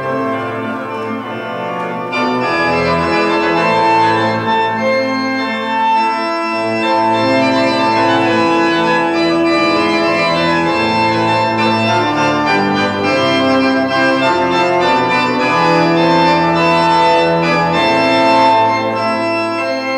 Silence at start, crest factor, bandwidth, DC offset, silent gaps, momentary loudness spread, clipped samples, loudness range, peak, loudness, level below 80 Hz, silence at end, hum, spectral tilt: 0 s; 12 dB; 11.5 kHz; under 0.1%; none; 6 LU; under 0.1%; 3 LU; -2 dBFS; -13 LUFS; -48 dBFS; 0 s; none; -5.5 dB/octave